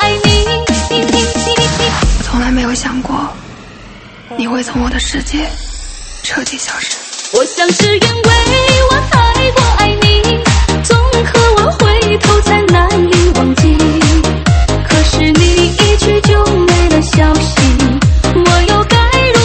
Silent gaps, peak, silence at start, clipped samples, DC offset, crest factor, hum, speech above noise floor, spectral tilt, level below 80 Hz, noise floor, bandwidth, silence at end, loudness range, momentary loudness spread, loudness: none; 0 dBFS; 0 s; 0.1%; under 0.1%; 10 dB; none; 23 dB; -4.5 dB/octave; -16 dBFS; -33 dBFS; 8.8 kHz; 0 s; 8 LU; 8 LU; -10 LUFS